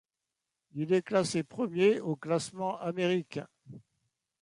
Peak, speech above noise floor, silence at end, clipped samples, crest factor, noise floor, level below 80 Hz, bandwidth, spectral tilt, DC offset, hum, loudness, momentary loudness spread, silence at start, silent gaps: -14 dBFS; 58 dB; 0.6 s; under 0.1%; 18 dB; -88 dBFS; -74 dBFS; 11.5 kHz; -5.5 dB/octave; under 0.1%; none; -31 LUFS; 15 LU; 0.75 s; none